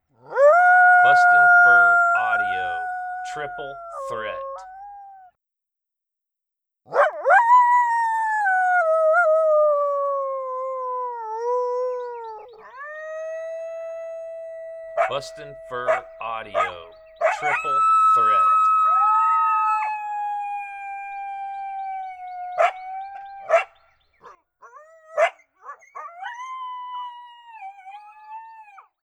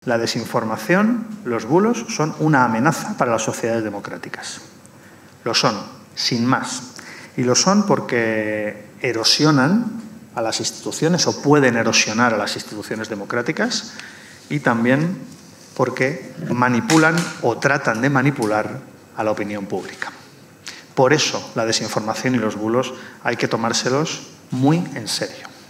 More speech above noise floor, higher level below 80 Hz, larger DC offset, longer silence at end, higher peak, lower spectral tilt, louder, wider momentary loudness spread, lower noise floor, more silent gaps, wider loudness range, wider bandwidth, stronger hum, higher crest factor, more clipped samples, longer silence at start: first, 62 dB vs 25 dB; about the same, -66 dBFS vs -70 dBFS; neither; first, 0.4 s vs 0.05 s; about the same, -4 dBFS vs -2 dBFS; second, -2.5 dB/octave vs -4 dB/octave; about the same, -19 LUFS vs -19 LUFS; first, 23 LU vs 15 LU; first, -85 dBFS vs -45 dBFS; neither; first, 14 LU vs 5 LU; second, 10.5 kHz vs 16 kHz; neither; about the same, 16 dB vs 18 dB; neither; first, 0.3 s vs 0.05 s